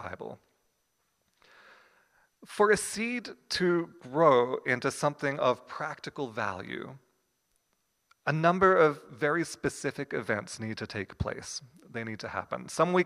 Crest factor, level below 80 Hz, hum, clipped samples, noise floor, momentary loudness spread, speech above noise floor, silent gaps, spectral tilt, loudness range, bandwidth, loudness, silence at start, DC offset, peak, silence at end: 22 dB; -60 dBFS; none; under 0.1%; -76 dBFS; 16 LU; 47 dB; none; -5 dB/octave; 6 LU; 15.5 kHz; -29 LUFS; 0 s; under 0.1%; -8 dBFS; 0 s